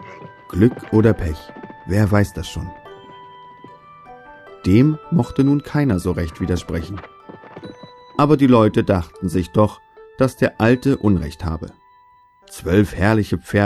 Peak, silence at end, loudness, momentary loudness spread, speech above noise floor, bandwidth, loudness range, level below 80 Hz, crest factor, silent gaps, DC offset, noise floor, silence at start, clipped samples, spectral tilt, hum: -2 dBFS; 0 s; -18 LUFS; 22 LU; 34 dB; 13.5 kHz; 5 LU; -38 dBFS; 18 dB; none; under 0.1%; -52 dBFS; 0 s; under 0.1%; -7.5 dB/octave; none